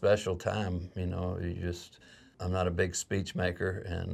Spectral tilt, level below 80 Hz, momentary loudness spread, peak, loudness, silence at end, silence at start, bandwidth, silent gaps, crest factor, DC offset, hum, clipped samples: -5.5 dB/octave; -56 dBFS; 8 LU; -14 dBFS; -33 LUFS; 0 s; 0 s; 13.5 kHz; none; 18 dB; under 0.1%; none; under 0.1%